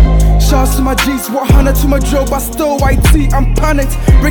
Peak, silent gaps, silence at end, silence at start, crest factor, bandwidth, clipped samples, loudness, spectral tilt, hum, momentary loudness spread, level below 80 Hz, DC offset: 0 dBFS; none; 0 s; 0 s; 8 dB; 19.5 kHz; under 0.1%; -12 LUFS; -5.5 dB/octave; none; 4 LU; -10 dBFS; under 0.1%